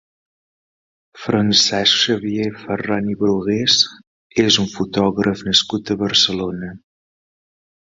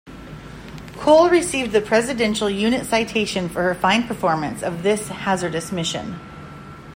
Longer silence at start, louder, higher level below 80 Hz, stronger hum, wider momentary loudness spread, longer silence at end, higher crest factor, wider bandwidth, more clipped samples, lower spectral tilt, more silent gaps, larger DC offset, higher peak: first, 1.15 s vs 0.05 s; first, -17 LUFS vs -20 LUFS; about the same, -52 dBFS vs -48 dBFS; neither; second, 11 LU vs 21 LU; first, 1.15 s vs 0 s; about the same, 20 dB vs 20 dB; second, 7.8 kHz vs 16 kHz; neither; about the same, -3.5 dB/octave vs -4.5 dB/octave; first, 4.07-4.30 s vs none; neither; about the same, 0 dBFS vs -2 dBFS